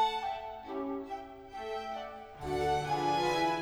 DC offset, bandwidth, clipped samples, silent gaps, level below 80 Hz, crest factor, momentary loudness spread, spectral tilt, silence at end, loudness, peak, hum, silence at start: under 0.1%; over 20 kHz; under 0.1%; none; -56 dBFS; 16 dB; 13 LU; -4.5 dB/octave; 0 s; -35 LUFS; -20 dBFS; none; 0 s